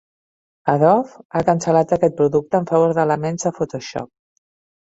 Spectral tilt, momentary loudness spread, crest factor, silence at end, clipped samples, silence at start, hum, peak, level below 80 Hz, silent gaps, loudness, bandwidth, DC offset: -6.5 dB/octave; 11 LU; 18 dB; 0.85 s; under 0.1%; 0.65 s; none; -2 dBFS; -56 dBFS; 1.25-1.30 s; -18 LUFS; 8 kHz; under 0.1%